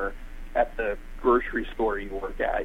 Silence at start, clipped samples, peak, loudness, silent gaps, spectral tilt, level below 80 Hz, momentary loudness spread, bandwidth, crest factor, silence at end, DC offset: 0 s; under 0.1%; -10 dBFS; -28 LUFS; none; -6.5 dB/octave; -38 dBFS; 10 LU; 12.5 kHz; 18 dB; 0 s; under 0.1%